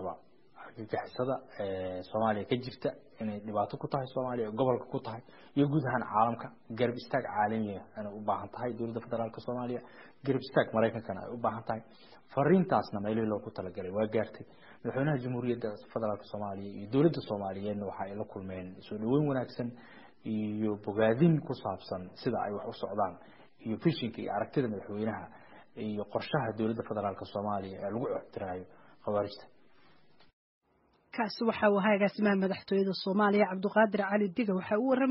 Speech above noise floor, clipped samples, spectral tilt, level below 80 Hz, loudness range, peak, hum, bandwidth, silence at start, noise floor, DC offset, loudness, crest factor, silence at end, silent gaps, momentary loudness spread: 38 dB; under 0.1%; -6 dB/octave; -68 dBFS; 6 LU; -12 dBFS; none; 5.8 kHz; 0 s; -70 dBFS; 0.1%; -33 LUFS; 20 dB; 0 s; 30.33-30.61 s; 14 LU